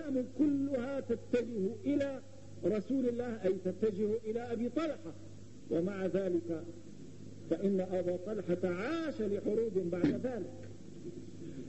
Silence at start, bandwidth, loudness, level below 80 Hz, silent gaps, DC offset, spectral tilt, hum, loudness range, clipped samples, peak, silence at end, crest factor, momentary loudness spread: 0 s; 8.4 kHz; -35 LUFS; -64 dBFS; none; 0.3%; -7.5 dB/octave; none; 2 LU; under 0.1%; -18 dBFS; 0 s; 18 dB; 16 LU